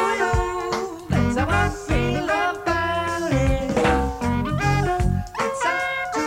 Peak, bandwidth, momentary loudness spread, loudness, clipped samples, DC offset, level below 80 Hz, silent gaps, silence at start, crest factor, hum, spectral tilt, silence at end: -8 dBFS; 16.5 kHz; 4 LU; -22 LUFS; under 0.1%; under 0.1%; -32 dBFS; none; 0 s; 14 dB; none; -5.5 dB/octave; 0 s